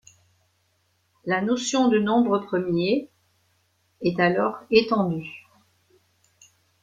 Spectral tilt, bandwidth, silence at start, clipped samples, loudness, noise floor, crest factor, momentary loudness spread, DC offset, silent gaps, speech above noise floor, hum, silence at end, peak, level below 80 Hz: -5 dB/octave; 9.4 kHz; 1.25 s; under 0.1%; -23 LUFS; -69 dBFS; 20 dB; 10 LU; under 0.1%; none; 46 dB; none; 1.45 s; -4 dBFS; -62 dBFS